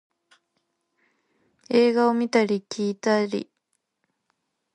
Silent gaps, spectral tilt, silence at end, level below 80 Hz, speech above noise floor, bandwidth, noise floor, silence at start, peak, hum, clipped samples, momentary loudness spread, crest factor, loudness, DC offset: none; -5.5 dB/octave; 1.3 s; -76 dBFS; 55 dB; 10.5 kHz; -77 dBFS; 1.7 s; -6 dBFS; none; under 0.1%; 9 LU; 20 dB; -23 LUFS; under 0.1%